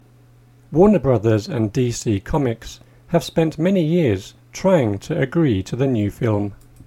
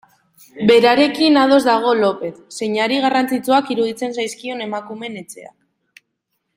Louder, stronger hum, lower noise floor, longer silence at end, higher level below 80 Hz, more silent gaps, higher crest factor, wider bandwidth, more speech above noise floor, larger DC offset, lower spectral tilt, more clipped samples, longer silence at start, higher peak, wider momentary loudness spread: second, -19 LUFS vs -16 LUFS; neither; second, -49 dBFS vs -73 dBFS; second, 0.3 s vs 1.1 s; first, -42 dBFS vs -62 dBFS; neither; about the same, 18 dB vs 18 dB; about the same, 16 kHz vs 16.5 kHz; second, 31 dB vs 56 dB; neither; first, -7 dB/octave vs -4.5 dB/octave; neither; first, 0.7 s vs 0.55 s; about the same, -2 dBFS vs 0 dBFS; second, 8 LU vs 17 LU